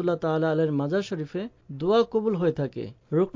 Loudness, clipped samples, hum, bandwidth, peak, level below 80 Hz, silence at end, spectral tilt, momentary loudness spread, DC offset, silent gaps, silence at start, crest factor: -26 LUFS; under 0.1%; none; 7.6 kHz; -10 dBFS; -60 dBFS; 0.05 s; -8 dB/octave; 11 LU; under 0.1%; none; 0 s; 16 dB